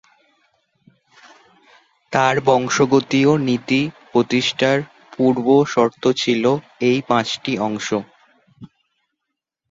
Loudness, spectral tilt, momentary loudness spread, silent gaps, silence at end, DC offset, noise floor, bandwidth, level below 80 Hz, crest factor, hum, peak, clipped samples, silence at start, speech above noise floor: -18 LUFS; -5 dB/octave; 7 LU; none; 1.05 s; under 0.1%; -80 dBFS; 7.8 kHz; -60 dBFS; 18 dB; none; -2 dBFS; under 0.1%; 2.1 s; 63 dB